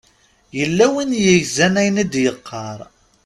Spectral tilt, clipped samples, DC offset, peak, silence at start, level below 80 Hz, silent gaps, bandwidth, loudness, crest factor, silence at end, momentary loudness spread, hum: -4.5 dB/octave; under 0.1%; under 0.1%; 0 dBFS; 0.55 s; -52 dBFS; none; 13 kHz; -16 LUFS; 18 dB; 0.4 s; 16 LU; none